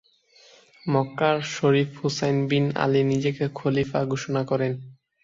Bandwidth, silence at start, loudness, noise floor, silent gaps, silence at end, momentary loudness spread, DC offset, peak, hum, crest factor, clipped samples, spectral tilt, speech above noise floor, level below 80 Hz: 7.6 kHz; 0.85 s; -24 LUFS; -56 dBFS; none; 0.3 s; 5 LU; under 0.1%; -6 dBFS; none; 18 dB; under 0.1%; -6.5 dB/octave; 33 dB; -60 dBFS